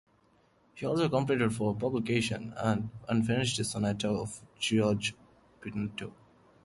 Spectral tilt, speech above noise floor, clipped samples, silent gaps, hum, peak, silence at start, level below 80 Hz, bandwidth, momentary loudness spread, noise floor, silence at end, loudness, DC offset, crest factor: -5 dB/octave; 36 dB; under 0.1%; none; none; -14 dBFS; 0.75 s; -60 dBFS; 11.5 kHz; 10 LU; -67 dBFS; 0.55 s; -31 LUFS; under 0.1%; 18 dB